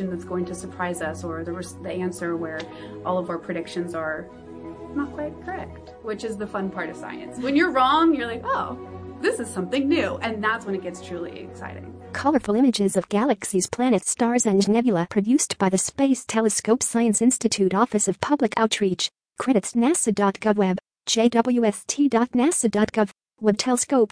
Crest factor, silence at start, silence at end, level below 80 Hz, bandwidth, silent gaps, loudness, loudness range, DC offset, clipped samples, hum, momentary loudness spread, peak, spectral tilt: 20 dB; 0 s; 0.05 s; -56 dBFS; 10.5 kHz; none; -23 LUFS; 9 LU; under 0.1%; under 0.1%; none; 14 LU; -4 dBFS; -4 dB/octave